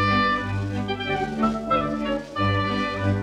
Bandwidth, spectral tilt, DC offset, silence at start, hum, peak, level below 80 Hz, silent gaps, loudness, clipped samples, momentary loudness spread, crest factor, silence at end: 10 kHz; -6.5 dB/octave; under 0.1%; 0 s; none; -10 dBFS; -44 dBFS; none; -24 LUFS; under 0.1%; 6 LU; 14 dB; 0 s